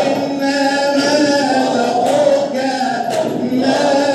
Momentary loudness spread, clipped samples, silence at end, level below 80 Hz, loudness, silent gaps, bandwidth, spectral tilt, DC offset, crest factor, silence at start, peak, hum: 5 LU; under 0.1%; 0 s; -68 dBFS; -15 LUFS; none; 13 kHz; -4 dB/octave; under 0.1%; 14 dB; 0 s; -2 dBFS; none